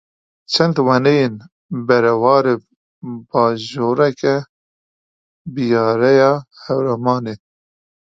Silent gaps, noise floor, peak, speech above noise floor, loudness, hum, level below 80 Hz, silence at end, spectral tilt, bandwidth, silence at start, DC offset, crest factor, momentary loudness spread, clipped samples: 1.52-1.69 s, 2.76-3.01 s, 4.49-5.45 s; under -90 dBFS; 0 dBFS; over 74 dB; -16 LUFS; none; -60 dBFS; 0.65 s; -6.5 dB/octave; 7.6 kHz; 0.5 s; under 0.1%; 18 dB; 17 LU; under 0.1%